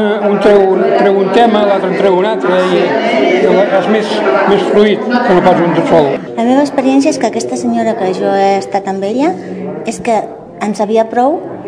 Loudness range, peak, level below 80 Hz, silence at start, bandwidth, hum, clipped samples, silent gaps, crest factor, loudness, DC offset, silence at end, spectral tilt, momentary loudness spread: 5 LU; 0 dBFS; -50 dBFS; 0 s; 10.5 kHz; none; 0.7%; none; 10 dB; -11 LUFS; under 0.1%; 0 s; -5.5 dB/octave; 7 LU